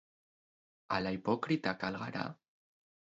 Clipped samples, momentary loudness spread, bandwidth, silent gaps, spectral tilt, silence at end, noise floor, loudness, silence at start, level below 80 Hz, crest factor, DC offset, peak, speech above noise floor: under 0.1%; 7 LU; 7.6 kHz; none; -4.5 dB/octave; 0.8 s; under -90 dBFS; -36 LUFS; 0.9 s; -68 dBFS; 22 dB; under 0.1%; -18 dBFS; over 55 dB